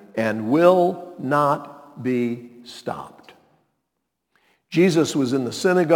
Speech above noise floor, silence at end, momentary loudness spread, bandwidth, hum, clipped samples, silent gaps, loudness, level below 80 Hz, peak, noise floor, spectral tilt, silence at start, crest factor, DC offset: 58 dB; 0 s; 18 LU; 18 kHz; none; under 0.1%; none; -21 LUFS; -70 dBFS; -2 dBFS; -78 dBFS; -6 dB/octave; 0.15 s; 20 dB; under 0.1%